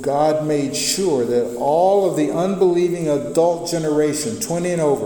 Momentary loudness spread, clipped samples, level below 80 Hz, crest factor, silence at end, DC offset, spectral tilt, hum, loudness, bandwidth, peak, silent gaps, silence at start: 5 LU; under 0.1%; -52 dBFS; 14 dB; 0 s; under 0.1%; -5 dB/octave; none; -18 LUFS; 19 kHz; -4 dBFS; none; 0 s